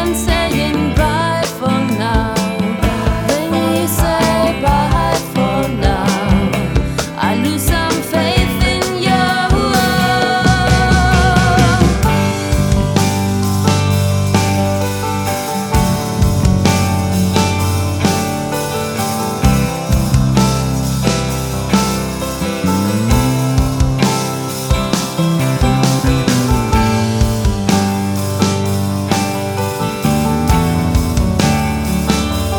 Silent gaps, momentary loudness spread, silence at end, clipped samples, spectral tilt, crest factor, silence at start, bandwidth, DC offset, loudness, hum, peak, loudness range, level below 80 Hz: none; 5 LU; 0 s; under 0.1%; -5 dB/octave; 14 dB; 0 s; over 20 kHz; under 0.1%; -15 LUFS; none; 0 dBFS; 3 LU; -22 dBFS